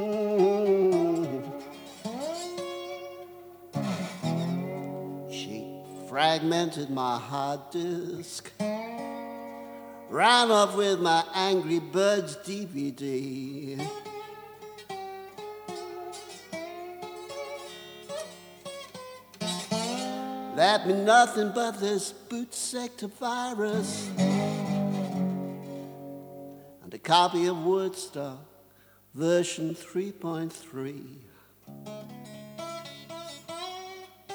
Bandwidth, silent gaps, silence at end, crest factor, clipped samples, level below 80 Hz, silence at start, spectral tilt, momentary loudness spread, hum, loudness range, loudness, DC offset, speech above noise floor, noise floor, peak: over 20 kHz; none; 0 s; 24 dB; under 0.1%; -76 dBFS; 0 s; -4.5 dB/octave; 20 LU; 50 Hz at -60 dBFS; 14 LU; -28 LUFS; under 0.1%; 32 dB; -59 dBFS; -6 dBFS